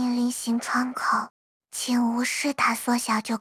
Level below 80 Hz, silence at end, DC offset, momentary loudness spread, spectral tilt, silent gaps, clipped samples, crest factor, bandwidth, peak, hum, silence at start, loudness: -72 dBFS; 0 s; under 0.1%; 5 LU; -2.5 dB/octave; 1.30-1.60 s; under 0.1%; 16 dB; 16 kHz; -10 dBFS; none; 0 s; -25 LUFS